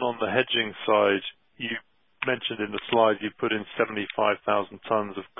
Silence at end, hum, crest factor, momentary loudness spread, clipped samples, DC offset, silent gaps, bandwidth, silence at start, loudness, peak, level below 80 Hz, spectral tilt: 0.15 s; none; 20 dB; 10 LU; under 0.1%; under 0.1%; none; 4 kHz; 0 s; -26 LUFS; -6 dBFS; -66 dBFS; -9 dB/octave